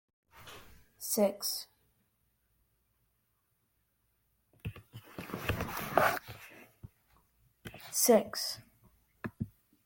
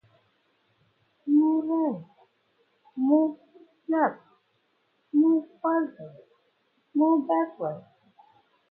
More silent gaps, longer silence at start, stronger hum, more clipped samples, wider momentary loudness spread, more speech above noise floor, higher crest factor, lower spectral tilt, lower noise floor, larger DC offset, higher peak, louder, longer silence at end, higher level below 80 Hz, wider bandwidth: neither; second, 0.35 s vs 1.25 s; neither; neither; first, 25 LU vs 20 LU; about the same, 48 dB vs 46 dB; first, 28 dB vs 18 dB; second, -3.5 dB/octave vs -11 dB/octave; first, -78 dBFS vs -71 dBFS; neither; about the same, -8 dBFS vs -10 dBFS; second, -32 LUFS vs -26 LUFS; second, 0.4 s vs 0.9 s; first, -60 dBFS vs -84 dBFS; first, 17 kHz vs 3.1 kHz